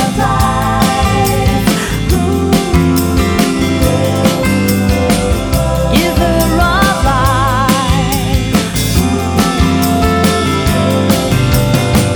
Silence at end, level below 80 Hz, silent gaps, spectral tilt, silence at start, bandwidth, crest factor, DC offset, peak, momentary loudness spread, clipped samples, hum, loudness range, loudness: 0 s; -20 dBFS; none; -5.5 dB/octave; 0 s; over 20 kHz; 12 dB; under 0.1%; 0 dBFS; 2 LU; under 0.1%; none; 1 LU; -12 LUFS